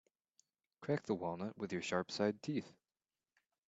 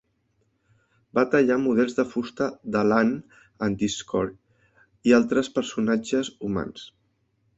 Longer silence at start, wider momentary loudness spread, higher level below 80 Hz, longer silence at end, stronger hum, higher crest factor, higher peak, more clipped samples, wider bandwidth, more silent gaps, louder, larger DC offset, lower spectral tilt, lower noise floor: second, 0.8 s vs 1.15 s; second, 7 LU vs 10 LU; second, -82 dBFS vs -58 dBFS; first, 0.95 s vs 0.7 s; neither; about the same, 22 dB vs 20 dB; second, -22 dBFS vs -6 dBFS; neither; about the same, 8 kHz vs 8 kHz; neither; second, -41 LUFS vs -24 LUFS; neither; about the same, -5.5 dB/octave vs -5.5 dB/octave; first, under -90 dBFS vs -70 dBFS